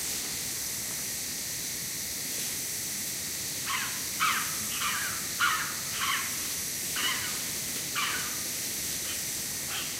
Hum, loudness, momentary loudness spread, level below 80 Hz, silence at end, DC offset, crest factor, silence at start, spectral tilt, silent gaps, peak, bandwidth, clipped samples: none; -30 LUFS; 5 LU; -60 dBFS; 0 s; under 0.1%; 18 dB; 0 s; 0 dB/octave; none; -14 dBFS; 16 kHz; under 0.1%